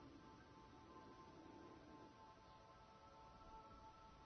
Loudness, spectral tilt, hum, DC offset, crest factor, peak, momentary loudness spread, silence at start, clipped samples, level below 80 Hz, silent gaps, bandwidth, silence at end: -64 LUFS; -4.5 dB/octave; none; under 0.1%; 14 dB; -50 dBFS; 3 LU; 0 s; under 0.1%; -74 dBFS; none; 6.4 kHz; 0 s